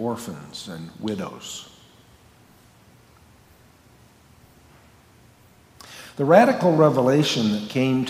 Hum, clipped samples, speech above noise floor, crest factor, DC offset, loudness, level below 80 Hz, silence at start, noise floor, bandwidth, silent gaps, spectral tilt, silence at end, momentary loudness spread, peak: none; under 0.1%; 33 dB; 22 dB; under 0.1%; -20 LUFS; -62 dBFS; 0 s; -53 dBFS; 16 kHz; none; -6 dB/octave; 0 s; 21 LU; -2 dBFS